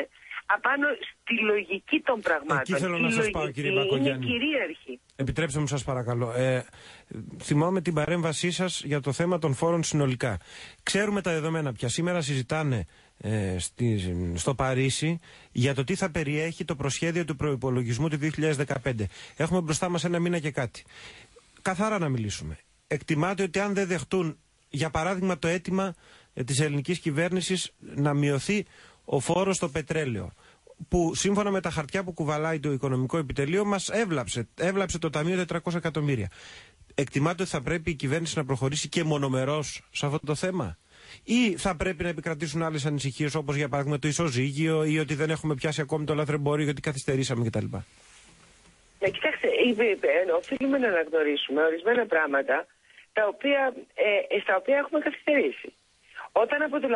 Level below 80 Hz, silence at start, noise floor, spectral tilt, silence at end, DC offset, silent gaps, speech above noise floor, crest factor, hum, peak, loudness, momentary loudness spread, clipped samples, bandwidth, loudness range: -50 dBFS; 0 s; -58 dBFS; -5 dB/octave; 0 s; under 0.1%; none; 31 dB; 18 dB; none; -10 dBFS; -27 LUFS; 9 LU; under 0.1%; 11.5 kHz; 3 LU